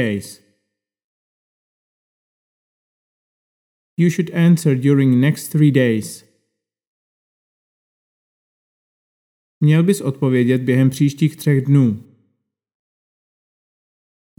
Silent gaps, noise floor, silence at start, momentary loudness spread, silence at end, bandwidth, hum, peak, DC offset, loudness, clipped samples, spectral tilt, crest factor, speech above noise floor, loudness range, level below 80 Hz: 1.04-3.97 s, 6.87-9.61 s; -76 dBFS; 0 s; 11 LU; 2.4 s; 17.5 kHz; none; -2 dBFS; under 0.1%; -16 LUFS; under 0.1%; -7.5 dB/octave; 18 dB; 61 dB; 8 LU; -70 dBFS